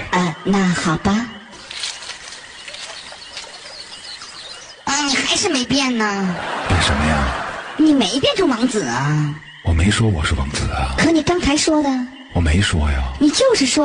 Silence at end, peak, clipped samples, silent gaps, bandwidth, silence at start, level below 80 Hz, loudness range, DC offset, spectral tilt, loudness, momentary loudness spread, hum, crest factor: 0 s; -4 dBFS; under 0.1%; none; 10 kHz; 0 s; -30 dBFS; 9 LU; under 0.1%; -4.5 dB/octave; -18 LUFS; 16 LU; none; 14 dB